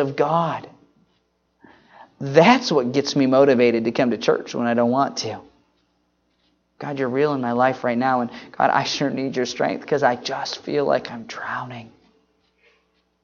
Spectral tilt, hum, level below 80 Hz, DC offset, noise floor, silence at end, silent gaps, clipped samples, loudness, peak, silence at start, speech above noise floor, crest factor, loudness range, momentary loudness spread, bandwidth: -5 dB/octave; none; -66 dBFS; under 0.1%; -67 dBFS; 1.35 s; none; under 0.1%; -20 LUFS; 0 dBFS; 0 s; 47 dB; 22 dB; 6 LU; 15 LU; 7.2 kHz